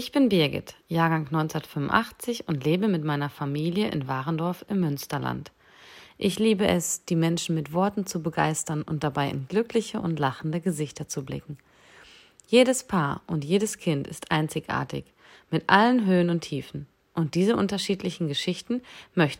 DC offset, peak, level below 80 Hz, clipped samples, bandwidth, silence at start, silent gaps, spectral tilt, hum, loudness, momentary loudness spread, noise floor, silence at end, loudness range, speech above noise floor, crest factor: under 0.1%; -4 dBFS; -58 dBFS; under 0.1%; 16 kHz; 0 s; none; -5 dB/octave; none; -26 LUFS; 11 LU; -53 dBFS; 0 s; 4 LU; 27 dB; 22 dB